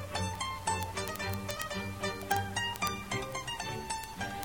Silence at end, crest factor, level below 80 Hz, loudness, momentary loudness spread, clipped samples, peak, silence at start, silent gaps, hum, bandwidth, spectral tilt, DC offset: 0 s; 30 dB; -54 dBFS; -35 LUFS; 5 LU; under 0.1%; -6 dBFS; 0 s; none; none; 19.5 kHz; -3.5 dB/octave; 0.1%